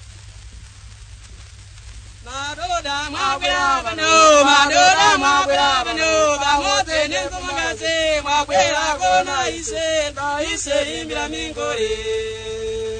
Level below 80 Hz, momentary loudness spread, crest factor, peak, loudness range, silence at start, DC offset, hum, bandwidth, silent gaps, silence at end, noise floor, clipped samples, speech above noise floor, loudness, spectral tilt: -40 dBFS; 13 LU; 18 dB; 0 dBFS; 9 LU; 0 s; under 0.1%; none; 9.6 kHz; none; 0 s; -39 dBFS; under 0.1%; 21 dB; -17 LUFS; -1.5 dB/octave